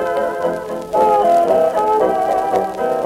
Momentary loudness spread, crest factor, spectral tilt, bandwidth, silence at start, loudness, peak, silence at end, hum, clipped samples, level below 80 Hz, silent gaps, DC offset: 8 LU; 12 dB; -5.5 dB/octave; 16 kHz; 0 s; -16 LUFS; -4 dBFS; 0 s; none; under 0.1%; -50 dBFS; none; under 0.1%